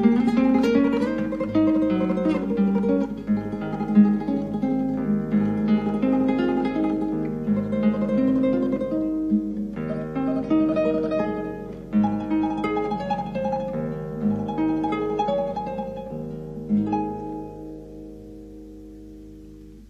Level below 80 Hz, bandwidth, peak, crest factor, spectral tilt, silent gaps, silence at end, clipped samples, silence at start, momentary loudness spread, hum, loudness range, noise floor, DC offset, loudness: -48 dBFS; 6.8 kHz; -6 dBFS; 18 dB; -9 dB/octave; none; 0.05 s; under 0.1%; 0 s; 16 LU; none; 6 LU; -43 dBFS; under 0.1%; -24 LUFS